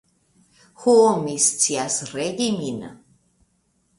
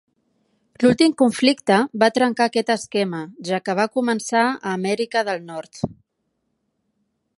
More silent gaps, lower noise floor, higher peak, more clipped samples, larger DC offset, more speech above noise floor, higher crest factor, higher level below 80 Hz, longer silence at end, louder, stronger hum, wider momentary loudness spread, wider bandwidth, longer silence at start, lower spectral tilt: neither; second, -67 dBFS vs -74 dBFS; about the same, -4 dBFS vs -2 dBFS; neither; neither; second, 46 dB vs 54 dB; about the same, 18 dB vs 20 dB; about the same, -64 dBFS vs -62 dBFS; second, 1.05 s vs 1.45 s; about the same, -20 LUFS vs -20 LUFS; neither; about the same, 14 LU vs 12 LU; about the same, 11.5 kHz vs 11.5 kHz; about the same, 0.8 s vs 0.8 s; second, -3 dB/octave vs -4.5 dB/octave